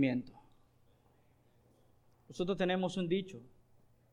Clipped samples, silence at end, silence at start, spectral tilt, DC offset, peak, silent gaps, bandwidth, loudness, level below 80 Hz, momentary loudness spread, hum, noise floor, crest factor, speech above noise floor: under 0.1%; 0.65 s; 0 s; -6.5 dB/octave; under 0.1%; -18 dBFS; none; 10.5 kHz; -36 LUFS; -68 dBFS; 20 LU; none; -69 dBFS; 20 dB; 34 dB